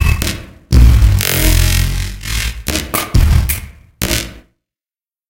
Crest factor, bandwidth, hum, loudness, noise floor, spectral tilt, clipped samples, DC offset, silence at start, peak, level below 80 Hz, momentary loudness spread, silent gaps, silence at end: 14 dB; 17.5 kHz; none; -14 LUFS; under -90 dBFS; -4 dB/octave; under 0.1%; under 0.1%; 0 s; 0 dBFS; -16 dBFS; 11 LU; none; 0.9 s